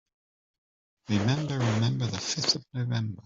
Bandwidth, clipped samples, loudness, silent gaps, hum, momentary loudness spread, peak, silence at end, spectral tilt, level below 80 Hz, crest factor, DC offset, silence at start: 7.8 kHz; under 0.1%; -28 LUFS; none; none; 5 LU; -12 dBFS; 0.05 s; -4.5 dB/octave; -62 dBFS; 18 dB; under 0.1%; 1.1 s